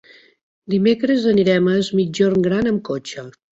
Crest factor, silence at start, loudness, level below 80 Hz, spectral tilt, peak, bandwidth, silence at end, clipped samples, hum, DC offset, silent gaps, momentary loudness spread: 14 dB; 0.7 s; -18 LUFS; -54 dBFS; -6.5 dB/octave; -4 dBFS; 8 kHz; 0.3 s; under 0.1%; none; under 0.1%; none; 12 LU